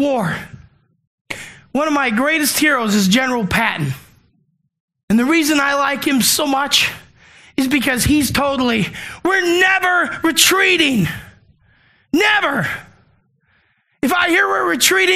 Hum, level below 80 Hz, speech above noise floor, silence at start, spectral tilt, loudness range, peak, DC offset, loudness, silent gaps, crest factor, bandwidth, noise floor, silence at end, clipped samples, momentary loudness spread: none; -44 dBFS; 47 dB; 0 s; -3 dB/octave; 3 LU; 0 dBFS; under 0.1%; -15 LUFS; 1.07-1.25 s, 4.80-4.88 s, 5.03-5.08 s; 18 dB; 15 kHz; -63 dBFS; 0 s; under 0.1%; 12 LU